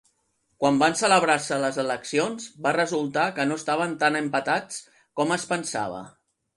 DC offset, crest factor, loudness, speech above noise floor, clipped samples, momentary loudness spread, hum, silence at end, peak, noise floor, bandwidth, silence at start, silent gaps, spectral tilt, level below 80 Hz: under 0.1%; 18 dB; -24 LUFS; 47 dB; under 0.1%; 10 LU; none; 0.5 s; -6 dBFS; -71 dBFS; 11.5 kHz; 0.6 s; none; -3.5 dB/octave; -68 dBFS